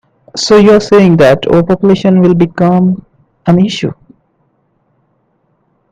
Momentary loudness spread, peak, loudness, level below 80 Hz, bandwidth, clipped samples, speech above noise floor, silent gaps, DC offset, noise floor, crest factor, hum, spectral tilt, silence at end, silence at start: 13 LU; 0 dBFS; -8 LUFS; -42 dBFS; 9.2 kHz; 0.3%; 50 dB; none; under 0.1%; -58 dBFS; 10 dB; none; -6.5 dB/octave; 2 s; 0.35 s